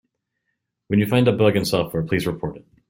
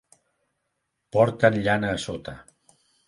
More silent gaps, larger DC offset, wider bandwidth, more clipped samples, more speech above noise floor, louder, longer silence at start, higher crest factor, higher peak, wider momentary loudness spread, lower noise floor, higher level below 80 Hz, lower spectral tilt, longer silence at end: neither; neither; first, 16.5 kHz vs 11.5 kHz; neither; about the same, 57 dB vs 55 dB; first, -20 LUFS vs -23 LUFS; second, 0.9 s vs 1.15 s; second, 18 dB vs 24 dB; about the same, -4 dBFS vs -4 dBFS; second, 10 LU vs 16 LU; about the same, -77 dBFS vs -78 dBFS; about the same, -50 dBFS vs -54 dBFS; about the same, -6.5 dB/octave vs -6 dB/octave; second, 0.3 s vs 0.65 s